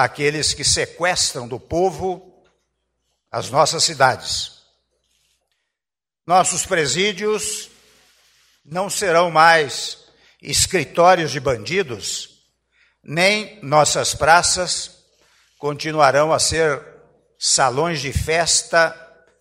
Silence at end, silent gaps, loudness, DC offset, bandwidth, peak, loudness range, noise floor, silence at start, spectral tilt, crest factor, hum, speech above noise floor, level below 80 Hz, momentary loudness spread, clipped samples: 0.35 s; none; -18 LUFS; under 0.1%; 16 kHz; 0 dBFS; 4 LU; -89 dBFS; 0 s; -2.5 dB/octave; 20 dB; none; 71 dB; -44 dBFS; 14 LU; under 0.1%